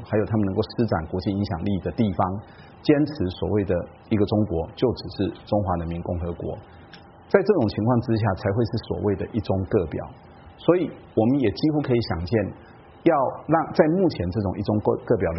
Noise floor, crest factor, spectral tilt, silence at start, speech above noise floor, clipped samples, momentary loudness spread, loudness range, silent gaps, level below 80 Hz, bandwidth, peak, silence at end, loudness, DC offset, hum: -46 dBFS; 20 dB; -7 dB/octave; 0 s; 23 dB; under 0.1%; 8 LU; 2 LU; none; -46 dBFS; 5.8 kHz; -2 dBFS; 0 s; -24 LUFS; under 0.1%; none